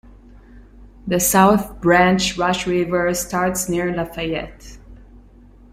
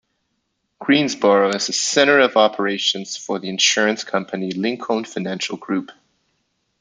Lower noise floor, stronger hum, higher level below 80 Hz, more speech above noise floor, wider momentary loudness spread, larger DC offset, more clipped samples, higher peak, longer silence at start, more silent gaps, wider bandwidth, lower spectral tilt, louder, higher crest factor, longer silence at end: second, -46 dBFS vs -72 dBFS; neither; first, -42 dBFS vs -68 dBFS; second, 28 dB vs 53 dB; about the same, 11 LU vs 12 LU; neither; neither; about the same, -2 dBFS vs -2 dBFS; second, 0.05 s vs 0.8 s; neither; first, 16 kHz vs 9.6 kHz; first, -4 dB/octave vs -2.5 dB/octave; about the same, -18 LUFS vs -18 LUFS; about the same, 18 dB vs 18 dB; second, 0.55 s vs 0.9 s